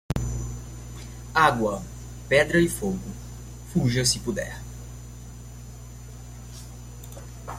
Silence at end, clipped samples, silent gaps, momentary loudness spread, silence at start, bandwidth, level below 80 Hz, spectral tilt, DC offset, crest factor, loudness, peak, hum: 0 s; under 0.1%; none; 21 LU; 0.1 s; 16.5 kHz; -40 dBFS; -4.5 dB/octave; under 0.1%; 24 dB; -24 LUFS; -4 dBFS; 60 Hz at -40 dBFS